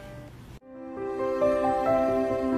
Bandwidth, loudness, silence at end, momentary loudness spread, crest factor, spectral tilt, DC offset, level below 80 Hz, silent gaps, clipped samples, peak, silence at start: 14.5 kHz; -26 LUFS; 0 s; 21 LU; 14 dB; -7 dB/octave; under 0.1%; -52 dBFS; none; under 0.1%; -14 dBFS; 0 s